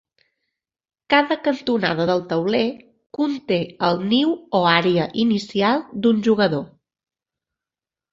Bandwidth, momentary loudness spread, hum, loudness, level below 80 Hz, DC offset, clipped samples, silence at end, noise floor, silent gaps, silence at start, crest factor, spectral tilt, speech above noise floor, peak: 7.6 kHz; 7 LU; none; -20 LUFS; -62 dBFS; under 0.1%; under 0.1%; 1.5 s; -90 dBFS; none; 1.1 s; 20 dB; -6.5 dB/octave; 70 dB; -2 dBFS